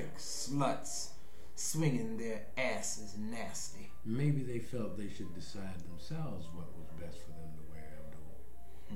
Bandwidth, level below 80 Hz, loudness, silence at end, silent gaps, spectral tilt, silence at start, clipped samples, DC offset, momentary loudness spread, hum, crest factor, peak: 16 kHz; -58 dBFS; -40 LUFS; 0 s; none; -4.5 dB/octave; 0 s; under 0.1%; 2%; 18 LU; none; 20 dB; -20 dBFS